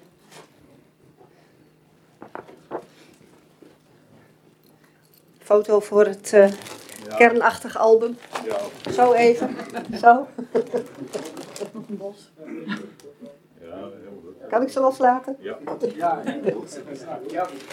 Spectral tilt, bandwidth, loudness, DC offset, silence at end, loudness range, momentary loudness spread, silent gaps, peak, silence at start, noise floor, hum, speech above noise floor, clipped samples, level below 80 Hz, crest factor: -5 dB/octave; 15.5 kHz; -21 LUFS; under 0.1%; 0 s; 13 LU; 22 LU; none; 0 dBFS; 0.35 s; -56 dBFS; none; 36 dB; under 0.1%; -70 dBFS; 24 dB